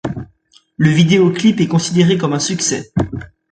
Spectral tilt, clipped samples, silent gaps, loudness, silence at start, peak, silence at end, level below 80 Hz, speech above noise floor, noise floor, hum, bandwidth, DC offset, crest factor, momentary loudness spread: -5 dB/octave; under 0.1%; none; -14 LUFS; 0.05 s; 0 dBFS; 0.25 s; -42 dBFS; 39 dB; -53 dBFS; none; 9.4 kHz; under 0.1%; 14 dB; 13 LU